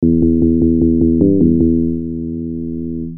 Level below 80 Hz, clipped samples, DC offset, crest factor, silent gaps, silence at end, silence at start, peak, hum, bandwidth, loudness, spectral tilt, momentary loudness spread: -30 dBFS; under 0.1%; under 0.1%; 14 dB; none; 0 s; 0 s; 0 dBFS; none; 1 kHz; -15 LUFS; -19 dB/octave; 11 LU